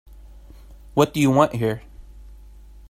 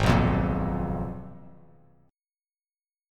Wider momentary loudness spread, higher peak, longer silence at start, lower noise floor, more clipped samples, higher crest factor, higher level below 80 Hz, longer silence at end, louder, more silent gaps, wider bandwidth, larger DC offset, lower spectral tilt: second, 9 LU vs 18 LU; first, -2 dBFS vs -6 dBFS; first, 0.7 s vs 0 s; second, -44 dBFS vs under -90 dBFS; neither; about the same, 20 dB vs 22 dB; second, -44 dBFS vs -38 dBFS; second, 0.55 s vs 1.6 s; first, -20 LUFS vs -27 LUFS; neither; first, 15.5 kHz vs 14 kHz; neither; about the same, -6.5 dB/octave vs -7.5 dB/octave